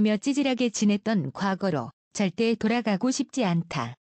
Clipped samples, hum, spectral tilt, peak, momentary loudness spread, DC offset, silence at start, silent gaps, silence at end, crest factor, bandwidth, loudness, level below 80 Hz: under 0.1%; none; -5.5 dB/octave; -14 dBFS; 5 LU; under 0.1%; 0 s; 1.93-2.11 s; 0.1 s; 12 dB; 8.8 kHz; -26 LUFS; -64 dBFS